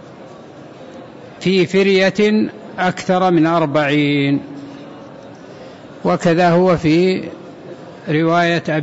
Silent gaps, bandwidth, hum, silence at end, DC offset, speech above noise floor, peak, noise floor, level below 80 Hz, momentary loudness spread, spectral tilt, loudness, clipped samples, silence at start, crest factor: none; 8 kHz; none; 0 s; under 0.1%; 22 dB; -4 dBFS; -37 dBFS; -52 dBFS; 23 LU; -6.5 dB/octave; -15 LUFS; under 0.1%; 0.05 s; 12 dB